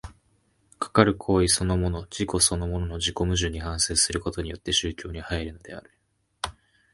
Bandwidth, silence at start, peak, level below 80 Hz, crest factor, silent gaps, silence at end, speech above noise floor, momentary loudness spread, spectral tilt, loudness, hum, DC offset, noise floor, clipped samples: 11.5 kHz; 0.05 s; -2 dBFS; -38 dBFS; 26 dB; none; 0.45 s; 41 dB; 14 LU; -3.5 dB/octave; -25 LUFS; none; under 0.1%; -66 dBFS; under 0.1%